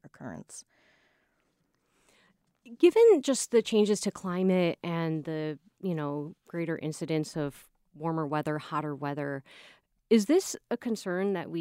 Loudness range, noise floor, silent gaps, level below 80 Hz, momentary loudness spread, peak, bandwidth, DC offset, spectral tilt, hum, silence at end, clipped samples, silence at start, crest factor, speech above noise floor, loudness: 8 LU; -74 dBFS; none; -72 dBFS; 14 LU; -10 dBFS; 16 kHz; under 0.1%; -5.5 dB/octave; none; 0 s; under 0.1%; 0.05 s; 20 dB; 46 dB; -29 LUFS